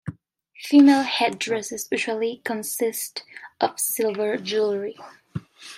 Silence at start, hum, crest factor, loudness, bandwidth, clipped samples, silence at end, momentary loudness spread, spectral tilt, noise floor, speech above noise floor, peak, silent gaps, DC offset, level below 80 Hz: 0.05 s; none; 20 dB; -22 LUFS; 16 kHz; under 0.1%; 0 s; 21 LU; -3.5 dB/octave; -52 dBFS; 30 dB; -4 dBFS; none; under 0.1%; -68 dBFS